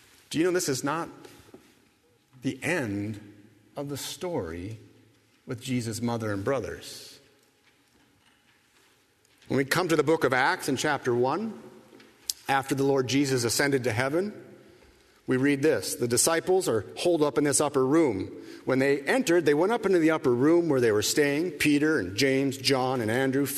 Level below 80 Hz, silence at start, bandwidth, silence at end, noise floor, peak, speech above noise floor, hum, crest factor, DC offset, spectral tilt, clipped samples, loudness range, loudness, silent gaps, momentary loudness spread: -64 dBFS; 0.3 s; 13.5 kHz; 0 s; -64 dBFS; -2 dBFS; 39 dB; none; 24 dB; under 0.1%; -4.5 dB/octave; under 0.1%; 11 LU; -26 LUFS; none; 14 LU